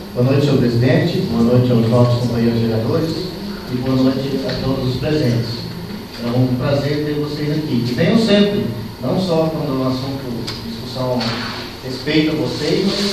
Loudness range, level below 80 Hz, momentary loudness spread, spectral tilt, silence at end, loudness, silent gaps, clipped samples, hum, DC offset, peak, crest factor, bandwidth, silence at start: 5 LU; -40 dBFS; 11 LU; -7 dB/octave; 0 s; -18 LUFS; none; under 0.1%; none; under 0.1%; 0 dBFS; 16 dB; 14 kHz; 0 s